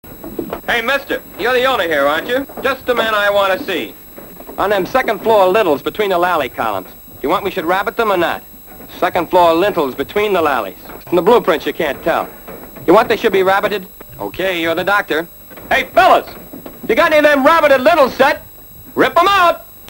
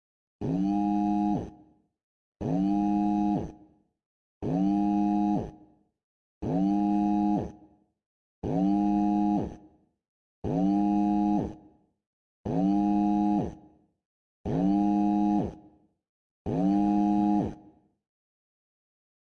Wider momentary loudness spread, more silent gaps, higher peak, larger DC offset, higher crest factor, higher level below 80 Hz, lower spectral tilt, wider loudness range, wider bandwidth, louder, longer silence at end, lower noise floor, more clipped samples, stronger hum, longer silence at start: first, 18 LU vs 13 LU; second, none vs 2.03-2.32 s, 4.06-4.41 s, 6.04-6.41 s, 8.06-8.42 s, 10.08-10.42 s, 12.07-12.44 s, 14.05-14.44 s, 16.09-16.45 s; first, 0 dBFS vs -16 dBFS; neither; about the same, 14 dB vs 12 dB; first, -44 dBFS vs -52 dBFS; second, -4.5 dB/octave vs -9.5 dB/octave; about the same, 4 LU vs 3 LU; first, 16.5 kHz vs 6.6 kHz; first, -14 LUFS vs -27 LUFS; second, 0 s vs 1.65 s; second, -36 dBFS vs -59 dBFS; neither; neither; second, 0.05 s vs 0.4 s